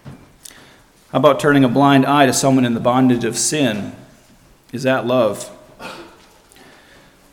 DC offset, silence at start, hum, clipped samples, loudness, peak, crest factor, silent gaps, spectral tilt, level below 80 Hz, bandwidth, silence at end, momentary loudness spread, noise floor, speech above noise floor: under 0.1%; 0.05 s; none; under 0.1%; -15 LUFS; 0 dBFS; 18 dB; none; -4.5 dB/octave; -52 dBFS; 17 kHz; 1.3 s; 21 LU; -49 dBFS; 35 dB